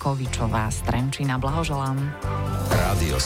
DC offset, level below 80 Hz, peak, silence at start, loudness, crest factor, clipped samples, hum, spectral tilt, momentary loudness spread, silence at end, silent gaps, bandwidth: under 0.1%; -32 dBFS; -10 dBFS; 0 s; -25 LUFS; 14 dB; under 0.1%; none; -5.5 dB/octave; 5 LU; 0 s; none; 16 kHz